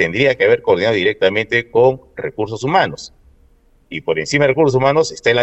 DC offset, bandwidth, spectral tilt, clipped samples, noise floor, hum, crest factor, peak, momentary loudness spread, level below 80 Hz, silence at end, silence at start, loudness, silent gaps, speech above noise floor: under 0.1%; 8.4 kHz; -5 dB/octave; under 0.1%; -52 dBFS; none; 16 dB; 0 dBFS; 13 LU; -48 dBFS; 0 s; 0 s; -15 LUFS; none; 36 dB